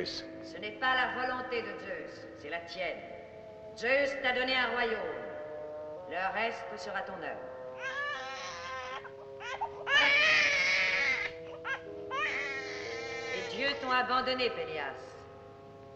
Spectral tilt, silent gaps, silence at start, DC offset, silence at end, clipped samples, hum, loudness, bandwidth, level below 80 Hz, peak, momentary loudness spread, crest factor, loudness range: -2.5 dB/octave; none; 0 s; under 0.1%; 0 s; under 0.1%; none; -32 LUFS; 8.4 kHz; -66 dBFS; -14 dBFS; 18 LU; 20 dB; 9 LU